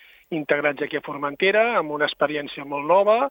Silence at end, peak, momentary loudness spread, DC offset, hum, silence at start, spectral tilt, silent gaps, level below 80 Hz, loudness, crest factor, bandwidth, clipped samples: 0 s; -6 dBFS; 12 LU; under 0.1%; none; 0.3 s; -7 dB/octave; none; -66 dBFS; -22 LUFS; 18 dB; 16.5 kHz; under 0.1%